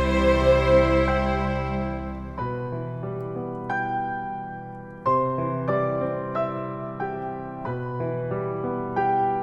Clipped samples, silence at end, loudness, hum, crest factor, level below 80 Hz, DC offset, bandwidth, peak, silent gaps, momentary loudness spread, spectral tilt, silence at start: under 0.1%; 0 s; -25 LUFS; none; 18 dB; -36 dBFS; under 0.1%; 9 kHz; -6 dBFS; none; 13 LU; -7.5 dB/octave; 0 s